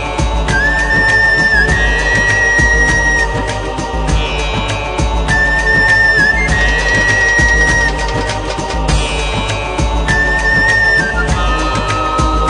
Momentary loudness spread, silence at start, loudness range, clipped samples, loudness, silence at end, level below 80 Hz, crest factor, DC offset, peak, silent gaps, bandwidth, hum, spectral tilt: 8 LU; 0 s; 3 LU; under 0.1%; -11 LUFS; 0 s; -18 dBFS; 12 dB; under 0.1%; 0 dBFS; none; 10.5 kHz; none; -4 dB/octave